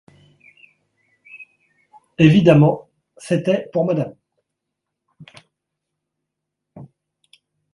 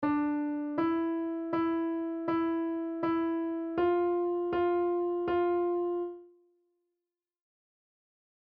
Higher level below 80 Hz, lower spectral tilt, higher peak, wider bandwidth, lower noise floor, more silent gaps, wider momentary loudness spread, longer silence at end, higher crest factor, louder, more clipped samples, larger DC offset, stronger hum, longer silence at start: first, -58 dBFS vs -66 dBFS; first, -8 dB/octave vs -5.5 dB/octave; first, 0 dBFS vs -20 dBFS; first, 11.5 kHz vs 4.6 kHz; second, -80 dBFS vs under -90 dBFS; neither; first, 28 LU vs 5 LU; second, 0.9 s vs 2.2 s; first, 22 dB vs 12 dB; first, -17 LUFS vs -31 LUFS; neither; neither; neither; first, 1.35 s vs 0 s